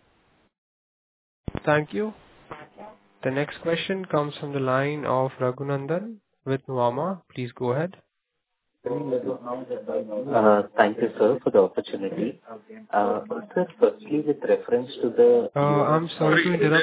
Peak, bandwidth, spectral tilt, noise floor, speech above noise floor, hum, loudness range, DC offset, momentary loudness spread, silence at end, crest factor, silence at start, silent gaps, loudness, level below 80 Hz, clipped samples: -4 dBFS; 4 kHz; -10.5 dB/octave; -80 dBFS; 56 dB; none; 7 LU; under 0.1%; 13 LU; 0 s; 22 dB; 1.65 s; none; -24 LUFS; -60 dBFS; under 0.1%